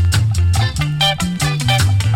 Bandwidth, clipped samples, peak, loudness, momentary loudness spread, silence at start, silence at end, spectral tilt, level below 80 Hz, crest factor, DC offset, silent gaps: 16.5 kHz; under 0.1%; -4 dBFS; -16 LUFS; 4 LU; 0 s; 0 s; -4.5 dB/octave; -28 dBFS; 12 dB; under 0.1%; none